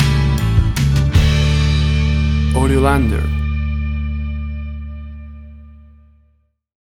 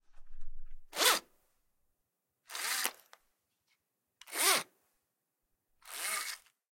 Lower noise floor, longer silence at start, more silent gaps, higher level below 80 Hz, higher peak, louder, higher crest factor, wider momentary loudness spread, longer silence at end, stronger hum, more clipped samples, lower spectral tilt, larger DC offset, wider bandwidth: second, -59 dBFS vs -85 dBFS; about the same, 0 s vs 0.1 s; neither; first, -20 dBFS vs -54 dBFS; first, -2 dBFS vs -8 dBFS; first, -16 LUFS vs -32 LUFS; second, 14 dB vs 30 dB; about the same, 17 LU vs 18 LU; first, 1.15 s vs 0.35 s; neither; neither; first, -6.5 dB/octave vs 1 dB/octave; neither; second, 13.5 kHz vs 17 kHz